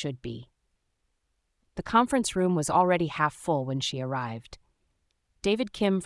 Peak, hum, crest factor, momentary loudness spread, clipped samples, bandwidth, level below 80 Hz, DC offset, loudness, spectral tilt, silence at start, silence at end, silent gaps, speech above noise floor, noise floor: -8 dBFS; none; 20 dB; 17 LU; under 0.1%; 12 kHz; -56 dBFS; under 0.1%; -27 LUFS; -5 dB/octave; 0 s; 0 s; none; 49 dB; -76 dBFS